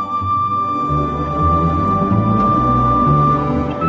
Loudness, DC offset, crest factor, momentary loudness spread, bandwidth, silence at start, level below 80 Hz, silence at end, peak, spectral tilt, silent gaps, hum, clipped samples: -15 LUFS; under 0.1%; 12 dB; 5 LU; 7.4 kHz; 0 s; -28 dBFS; 0 s; -4 dBFS; -9.5 dB/octave; none; none; under 0.1%